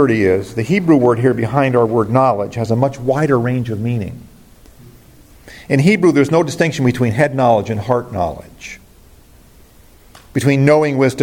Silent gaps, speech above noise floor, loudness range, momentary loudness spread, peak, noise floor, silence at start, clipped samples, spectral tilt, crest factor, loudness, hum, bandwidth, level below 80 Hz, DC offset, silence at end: none; 30 dB; 5 LU; 11 LU; 0 dBFS; -45 dBFS; 0 s; under 0.1%; -7 dB/octave; 14 dB; -15 LUFS; none; 17 kHz; -46 dBFS; under 0.1%; 0 s